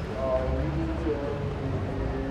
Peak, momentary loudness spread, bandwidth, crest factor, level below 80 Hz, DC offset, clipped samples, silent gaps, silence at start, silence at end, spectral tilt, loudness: -14 dBFS; 4 LU; 9.4 kHz; 14 dB; -36 dBFS; under 0.1%; under 0.1%; none; 0 s; 0 s; -8.5 dB/octave; -30 LUFS